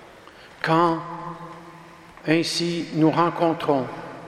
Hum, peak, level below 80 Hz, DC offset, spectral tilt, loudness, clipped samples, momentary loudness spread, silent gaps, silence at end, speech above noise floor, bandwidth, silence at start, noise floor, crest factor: none; -4 dBFS; -62 dBFS; under 0.1%; -5.5 dB/octave; -22 LUFS; under 0.1%; 18 LU; none; 0 s; 25 dB; 14 kHz; 0 s; -46 dBFS; 20 dB